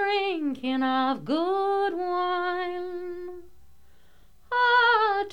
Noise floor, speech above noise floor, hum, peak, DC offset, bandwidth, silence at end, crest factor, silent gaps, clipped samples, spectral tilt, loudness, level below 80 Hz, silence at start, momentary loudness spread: -60 dBFS; 34 dB; none; -10 dBFS; 0.4%; 10 kHz; 0 s; 16 dB; none; under 0.1%; -5 dB/octave; -25 LUFS; -62 dBFS; 0 s; 15 LU